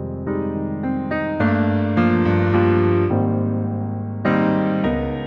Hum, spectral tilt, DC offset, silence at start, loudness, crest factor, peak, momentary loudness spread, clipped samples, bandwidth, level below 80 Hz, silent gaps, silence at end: none; -10 dB/octave; under 0.1%; 0 s; -20 LUFS; 14 dB; -6 dBFS; 8 LU; under 0.1%; 5.4 kHz; -42 dBFS; none; 0 s